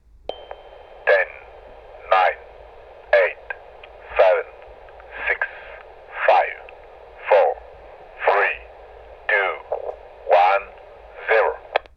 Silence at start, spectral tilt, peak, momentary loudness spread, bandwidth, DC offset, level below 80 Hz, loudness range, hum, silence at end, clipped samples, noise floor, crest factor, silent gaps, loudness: 0.3 s; -4 dB/octave; -2 dBFS; 22 LU; 6.2 kHz; under 0.1%; -52 dBFS; 1 LU; none; 0.15 s; under 0.1%; -43 dBFS; 22 dB; none; -20 LUFS